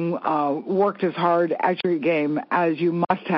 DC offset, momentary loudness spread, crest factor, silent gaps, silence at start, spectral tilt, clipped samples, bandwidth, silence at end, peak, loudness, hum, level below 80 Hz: under 0.1%; 3 LU; 16 dB; none; 0 s; -5 dB/octave; under 0.1%; 5.8 kHz; 0 s; -6 dBFS; -22 LUFS; none; -74 dBFS